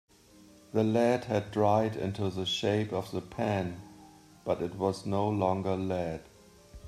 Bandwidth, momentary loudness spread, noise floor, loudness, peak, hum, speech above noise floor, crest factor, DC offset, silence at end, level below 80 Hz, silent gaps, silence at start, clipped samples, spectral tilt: 14 kHz; 10 LU; -57 dBFS; -31 LUFS; -12 dBFS; none; 27 dB; 18 dB; under 0.1%; 0 s; -62 dBFS; none; 0.75 s; under 0.1%; -6.5 dB/octave